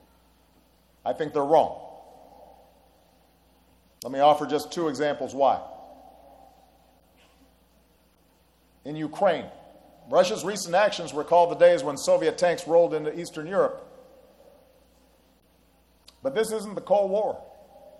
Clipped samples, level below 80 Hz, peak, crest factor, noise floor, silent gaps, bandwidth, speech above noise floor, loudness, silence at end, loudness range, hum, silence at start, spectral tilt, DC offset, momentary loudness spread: under 0.1%; -66 dBFS; -6 dBFS; 22 dB; -62 dBFS; none; 13 kHz; 39 dB; -24 LUFS; 0.1 s; 10 LU; none; 1.05 s; -4 dB/octave; under 0.1%; 15 LU